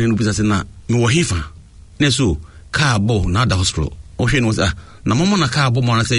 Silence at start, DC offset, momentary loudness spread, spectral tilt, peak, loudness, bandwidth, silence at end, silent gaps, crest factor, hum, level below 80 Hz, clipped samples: 0 s; under 0.1%; 9 LU; -5 dB/octave; -4 dBFS; -17 LUFS; 11 kHz; 0 s; none; 14 dB; none; -34 dBFS; under 0.1%